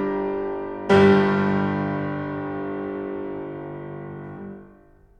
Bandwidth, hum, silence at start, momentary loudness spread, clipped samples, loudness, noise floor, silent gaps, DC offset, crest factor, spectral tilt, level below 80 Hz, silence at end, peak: 8.8 kHz; none; 0 s; 20 LU; under 0.1%; -23 LUFS; -52 dBFS; none; under 0.1%; 20 dB; -8 dB/octave; -54 dBFS; 0.5 s; -4 dBFS